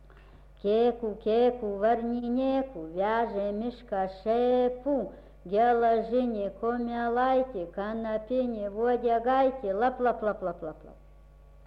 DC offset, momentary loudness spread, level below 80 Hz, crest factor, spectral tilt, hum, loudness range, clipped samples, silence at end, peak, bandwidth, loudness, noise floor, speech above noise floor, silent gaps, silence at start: under 0.1%; 9 LU; -52 dBFS; 14 dB; -8 dB/octave; none; 1 LU; under 0.1%; 0.7 s; -14 dBFS; 5.6 kHz; -28 LUFS; -53 dBFS; 25 dB; none; 0.15 s